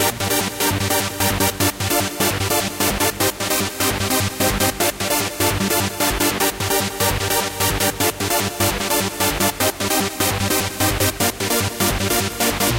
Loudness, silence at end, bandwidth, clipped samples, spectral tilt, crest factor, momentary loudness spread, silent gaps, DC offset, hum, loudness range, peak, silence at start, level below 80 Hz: -19 LUFS; 0 s; 17 kHz; under 0.1%; -3 dB/octave; 14 dB; 2 LU; none; under 0.1%; none; 0 LU; -6 dBFS; 0 s; -36 dBFS